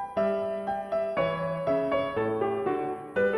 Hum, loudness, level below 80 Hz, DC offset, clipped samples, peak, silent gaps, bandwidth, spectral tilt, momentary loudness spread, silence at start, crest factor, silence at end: none; -29 LUFS; -60 dBFS; under 0.1%; under 0.1%; -16 dBFS; none; 11.5 kHz; -7.5 dB/octave; 4 LU; 0 s; 12 dB; 0 s